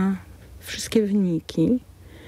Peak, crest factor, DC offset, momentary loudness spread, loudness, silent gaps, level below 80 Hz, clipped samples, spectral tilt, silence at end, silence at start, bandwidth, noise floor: -6 dBFS; 18 dB; under 0.1%; 12 LU; -24 LUFS; none; -50 dBFS; under 0.1%; -6 dB/octave; 0 s; 0 s; 16 kHz; -43 dBFS